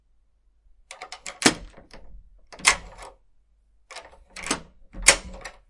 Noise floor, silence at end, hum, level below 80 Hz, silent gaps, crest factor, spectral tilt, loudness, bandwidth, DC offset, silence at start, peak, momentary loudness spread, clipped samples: -62 dBFS; 0.2 s; none; -46 dBFS; none; 28 dB; -1 dB/octave; -22 LUFS; 12 kHz; under 0.1%; 0.9 s; 0 dBFS; 25 LU; under 0.1%